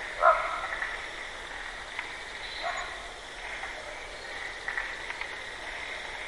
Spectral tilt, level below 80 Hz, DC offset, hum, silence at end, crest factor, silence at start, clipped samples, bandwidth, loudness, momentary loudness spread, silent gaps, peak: -1.5 dB/octave; -54 dBFS; under 0.1%; none; 0 s; 24 dB; 0 s; under 0.1%; 11.5 kHz; -33 LUFS; 11 LU; none; -10 dBFS